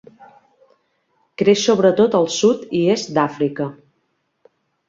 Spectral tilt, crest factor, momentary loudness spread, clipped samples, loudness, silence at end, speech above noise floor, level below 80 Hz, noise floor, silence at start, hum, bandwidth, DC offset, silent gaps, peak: -5 dB/octave; 18 dB; 10 LU; under 0.1%; -17 LUFS; 1.15 s; 52 dB; -62 dBFS; -69 dBFS; 1.4 s; none; 7.8 kHz; under 0.1%; none; -2 dBFS